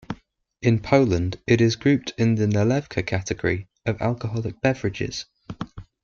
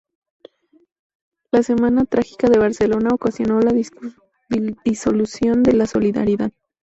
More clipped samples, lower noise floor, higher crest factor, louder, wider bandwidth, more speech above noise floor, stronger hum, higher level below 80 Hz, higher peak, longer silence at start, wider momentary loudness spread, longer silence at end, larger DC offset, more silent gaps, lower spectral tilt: neither; first, -53 dBFS vs -48 dBFS; about the same, 20 dB vs 16 dB; second, -23 LUFS vs -18 LUFS; second, 7.4 kHz vs 8.2 kHz; about the same, 31 dB vs 31 dB; neither; about the same, -50 dBFS vs -48 dBFS; about the same, -4 dBFS vs -4 dBFS; second, 0.1 s vs 1.55 s; first, 17 LU vs 8 LU; second, 0.2 s vs 0.35 s; neither; neither; about the same, -6.5 dB/octave vs -6.5 dB/octave